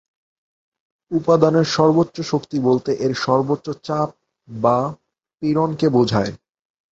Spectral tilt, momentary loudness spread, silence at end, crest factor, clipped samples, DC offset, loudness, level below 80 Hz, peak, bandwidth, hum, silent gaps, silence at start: -6.5 dB/octave; 10 LU; 0.55 s; 20 dB; under 0.1%; under 0.1%; -19 LUFS; -54 dBFS; 0 dBFS; 8 kHz; none; none; 1.1 s